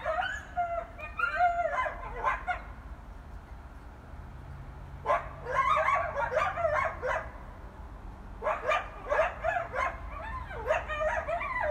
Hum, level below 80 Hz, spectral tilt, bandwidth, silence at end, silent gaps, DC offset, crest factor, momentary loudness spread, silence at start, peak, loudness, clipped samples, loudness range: none; -46 dBFS; -5 dB/octave; 13.5 kHz; 0 s; none; under 0.1%; 18 dB; 20 LU; 0 s; -16 dBFS; -31 LUFS; under 0.1%; 6 LU